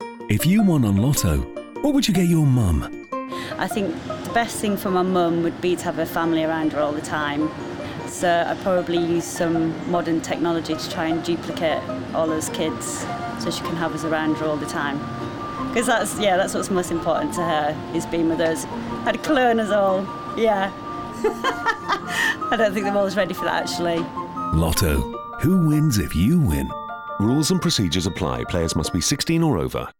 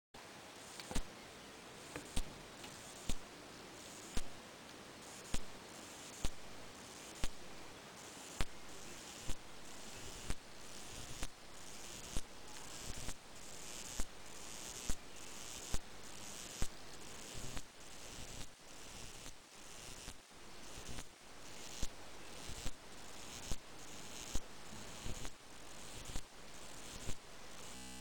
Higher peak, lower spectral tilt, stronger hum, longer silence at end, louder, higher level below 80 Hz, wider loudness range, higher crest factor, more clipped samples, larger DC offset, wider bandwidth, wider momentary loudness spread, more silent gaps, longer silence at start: first, -6 dBFS vs -16 dBFS; first, -5 dB/octave vs -2.5 dB/octave; neither; about the same, 0.1 s vs 0 s; first, -22 LUFS vs -50 LUFS; first, -40 dBFS vs -52 dBFS; about the same, 4 LU vs 3 LU; second, 14 dB vs 28 dB; neither; neither; first, over 20 kHz vs 17.5 kHz; about the same, 8 LU vs 7 LU; neither; second, 0 s vs 0.15 s